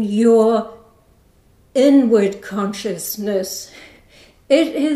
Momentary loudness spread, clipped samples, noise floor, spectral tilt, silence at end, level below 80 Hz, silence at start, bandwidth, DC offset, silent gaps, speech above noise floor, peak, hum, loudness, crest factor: 13 LU; under 0.1%; -53 dBFS; -5 dB/octave; 0 s; -58 dBFS; 0 s; 15.5 kHz; under 0.1%; none; 37 dB; -2 dBFS; none; -17 LUFS; 16 dB